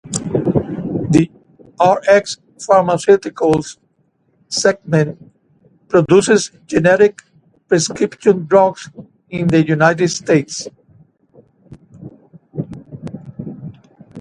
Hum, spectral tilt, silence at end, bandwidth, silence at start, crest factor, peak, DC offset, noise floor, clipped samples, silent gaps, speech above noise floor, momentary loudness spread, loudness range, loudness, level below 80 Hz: none; -5.5 dB/octave; 0 s; 11 kHz; 0.05 s; 16 dB; 0 dBFS; under 0.1%; -61 dBFS; under 0.1%; none; 47 dB; 19 LU; 9 LU; -15 LUFS; -50 dBFS